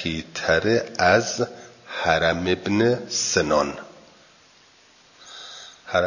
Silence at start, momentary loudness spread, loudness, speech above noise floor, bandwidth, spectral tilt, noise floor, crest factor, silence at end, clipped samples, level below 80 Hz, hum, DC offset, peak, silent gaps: 0 s; 20 LU; -22 LUFS; 33 dB; 7.4 kHz; -3.5 dB/octave; -54 dBFS; 20 dB; 0 s; under 0.1%; -48 dBFS; none; under 0.1%; -4 dBFS; none